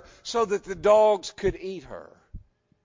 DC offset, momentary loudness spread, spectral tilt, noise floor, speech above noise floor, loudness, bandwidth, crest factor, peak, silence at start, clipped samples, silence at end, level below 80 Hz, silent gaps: under 0.1%; 20 LU; -4.5 dB/octave; -46 dBFS; 22 dB; -24 LUFS; 7.6 kHz; 18 dB; -8 dBFS; 0.25 s; under 0.1%; 0.45 s; -48 dBFS; none